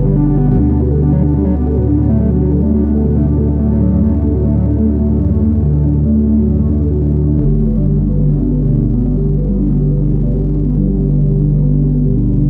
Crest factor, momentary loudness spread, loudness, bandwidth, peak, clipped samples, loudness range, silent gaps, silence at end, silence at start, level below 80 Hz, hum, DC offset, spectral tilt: 10 dB; 2 LU; -13 LUFS; 2.1 kHz; -2 dBFS; under 0.1%; 1 LU; none; 0 s; 0 s; -16 dBFS; none; under 0.1%; -14 dB/octave